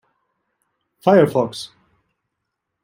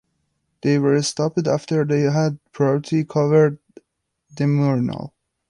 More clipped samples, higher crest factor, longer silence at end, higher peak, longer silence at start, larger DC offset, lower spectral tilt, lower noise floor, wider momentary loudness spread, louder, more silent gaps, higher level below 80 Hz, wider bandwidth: neither; about the same, 20 dB vs 16 dB; first, 1.15 s vs 0.4 s; about the same, -2 dBFS vs -4 dBFS; first, 1.05 s vs 0.65 s; neither; about the same, -6.5 dB/octave vs -6.5 dB/octave; first, -78 dBFS vs -74 dBFS; first, 19 LU vs 9 LU; first, -17 LUFS vs -20 LUFS; neither; second, -66 dBFS vs -60 dBFS; first, 16.5 kHz vs 11 kHz